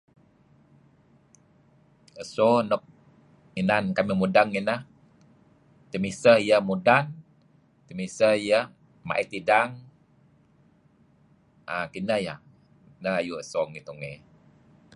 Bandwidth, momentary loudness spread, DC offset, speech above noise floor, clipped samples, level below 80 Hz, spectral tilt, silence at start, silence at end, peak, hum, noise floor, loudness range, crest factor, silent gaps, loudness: 11 kHz; 18 LU; under 0.1%; 37 dB; under 0.1%; -64 dBFS; -5.5 dB/octave; 2.15 s; 0.8 s; -4 dBFS; none; -61 dBFS; 9 LU; 24 dB; none; -25 LUFS